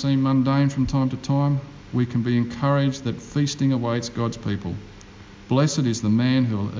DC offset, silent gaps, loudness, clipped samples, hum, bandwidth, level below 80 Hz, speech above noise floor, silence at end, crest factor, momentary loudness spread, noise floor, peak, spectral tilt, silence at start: under 0.1%; none; -23 LUFS; under 0.1%; none; 7.6 kHz; -46 dBFS; 22 dB; 0 s; 14 dB; 8 LU; -43 dBFS; -8 dBFS; -6.5 dB/octave; 0 s